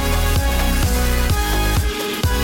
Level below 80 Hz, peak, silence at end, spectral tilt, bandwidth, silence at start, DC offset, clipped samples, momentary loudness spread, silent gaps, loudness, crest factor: -20 dBFS; -8 dBFS; 0 s; -4.5 dB/octave; 17 kHz; 0 s; under 0.1%; under 0.1%; 2 LU; none; -19 LUFS; 10 dB